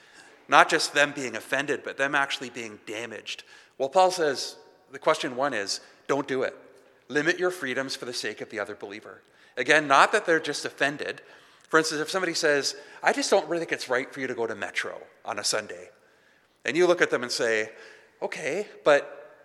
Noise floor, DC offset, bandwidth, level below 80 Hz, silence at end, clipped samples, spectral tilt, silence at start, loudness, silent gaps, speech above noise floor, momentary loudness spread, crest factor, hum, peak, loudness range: -62 dBFS; under 0.1%; 14 kHz; -84 dBFS; 0.15 s; under 0.1%; -2.5 dB/octave; 0.2 s; -26 LUFS; none; 36 dB; 15 LU; 26 dB; none; -2 dBFS; 5 LU